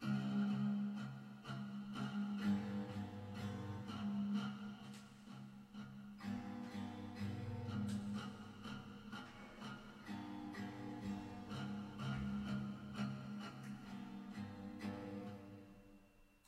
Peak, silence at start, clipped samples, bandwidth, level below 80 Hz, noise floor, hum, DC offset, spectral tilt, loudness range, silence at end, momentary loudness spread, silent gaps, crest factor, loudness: -28 dBFS; 0 s; under 0.1%; 12.5 kHz; -70 dBFS; -68 dBFS; none; under 0.1%; -7 dB/octave; 6 LU; 0.1 s; 14 LU; none; 16 dB; -47 LUFS